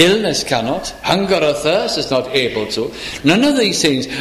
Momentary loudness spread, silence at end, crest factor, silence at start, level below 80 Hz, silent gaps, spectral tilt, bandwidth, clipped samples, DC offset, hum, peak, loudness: 8 LU; 0 s; 16 dB; 0 s; -44 dBFS; none; -4 dB/octave; 15.5 kHz; under 0.1%; under 0.1%; none; 0 dBFS; -16 LUFS